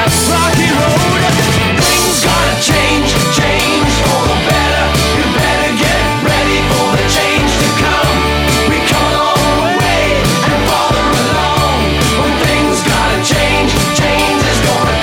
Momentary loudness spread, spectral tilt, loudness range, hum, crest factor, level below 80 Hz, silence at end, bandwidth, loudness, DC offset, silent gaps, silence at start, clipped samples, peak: 1 LU; -4 dB/octave; 1 LU; none; 12 dB; -22 dBFS; 0 s; 19 kHz; -11 LUFS; under 0.1%; none; 0 s; under 0.1%; 0 dBFS